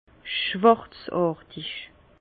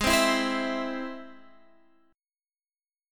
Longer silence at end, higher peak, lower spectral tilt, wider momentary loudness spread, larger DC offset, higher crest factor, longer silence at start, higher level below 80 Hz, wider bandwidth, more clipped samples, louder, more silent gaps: second, 0.35 s vs 1.75 s; first, -4 dBFS vs -10 dBFS; first, -9.5 dB/octave vs -2.5 dB/octave; about the same, 15 LU vs 17 LU; neither; about the same, 22 dB vs 22 dB; first, 0.25 s vs 0 s; second, -60 dBFS vs -50 dBFS; second, 4.8 kHz vs 17 kHz; neither; about the same, -25 LUFS vs -27 LUFS; neither